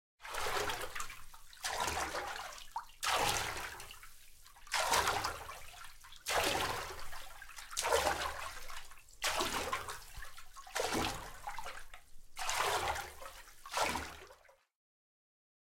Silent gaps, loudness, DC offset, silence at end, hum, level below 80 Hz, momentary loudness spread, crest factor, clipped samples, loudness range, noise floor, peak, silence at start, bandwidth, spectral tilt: none; -37 LUFS; under 0.1%; 1.25 s; none; -54 dBFS; 20 LU; 24 dB; under 0.1%; 3 LU; -63 dBFS; -14 dBFS; 0.2 s; 16.5 kHz; -1.5 dB/octave